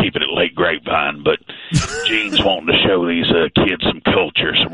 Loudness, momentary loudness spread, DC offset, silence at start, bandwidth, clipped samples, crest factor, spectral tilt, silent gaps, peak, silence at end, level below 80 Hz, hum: -16 LUFS; 5 LU; under 0.1%; 0 s; 11.5 kHz; under 0.1%; 16 dB; -4.5 dB/octave; none; -2 dBFS; 0 s; -38 dBFS; none